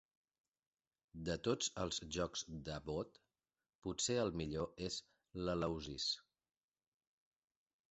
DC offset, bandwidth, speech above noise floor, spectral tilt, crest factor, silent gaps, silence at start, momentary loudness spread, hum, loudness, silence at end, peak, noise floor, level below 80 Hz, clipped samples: under 0.1%; 8 kHz; over 48 dB; -4 dB/octave; 20 dB; 3.75-3.82 s; 1.15 s; 9 LU; none; -42 LUFS; 1.7 s; -24 dBFS; under -90 dBFS; -62 dBFS; under 0.1%